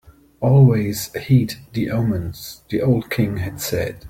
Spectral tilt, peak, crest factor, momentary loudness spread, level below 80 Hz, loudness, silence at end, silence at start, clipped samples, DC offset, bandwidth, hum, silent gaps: -7 dB/octave; -4 dBFS; 16 dB; 12 LU; -46 dBFS; -19 LUFS; 0 s; 0.4 s; under 0.1%; under 0.1%; 16.5 kHz; none; none